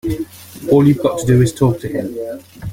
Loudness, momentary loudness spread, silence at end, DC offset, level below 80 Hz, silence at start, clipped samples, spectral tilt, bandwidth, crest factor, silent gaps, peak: -15 LUFS; 17 LU; 0 s; under 0.1%; -40 dBFS; 0.05 s; under 0.1%; -7.5 dB/octave; 16.5 kHz; 14 dB; none; -2 dBFS